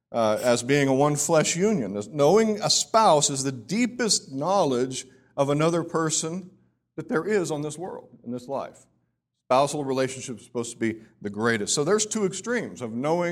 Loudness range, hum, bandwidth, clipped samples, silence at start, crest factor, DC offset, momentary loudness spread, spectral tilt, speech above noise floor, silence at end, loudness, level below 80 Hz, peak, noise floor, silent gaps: 8 LU; none; 16 kHz; under 0.1%; 0.1 s; 18 dB; under 0.1%; 15 LU; -4 dB/octave; 52 dB; 0 s; -24 LUFS; -66 dBFS; -6 dBFS; -76 dBFS; none